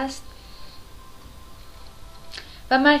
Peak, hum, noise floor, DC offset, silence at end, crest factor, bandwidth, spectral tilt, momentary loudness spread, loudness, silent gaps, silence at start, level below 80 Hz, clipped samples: -4 dBFS; none; -42 dBFS; under 0.1%; 0 s; 22 dB; 15.5 kHz; -4 dB/octave; 26 LU; -20 LUFS; none; 0 s; -46 dBFS; under 0.1%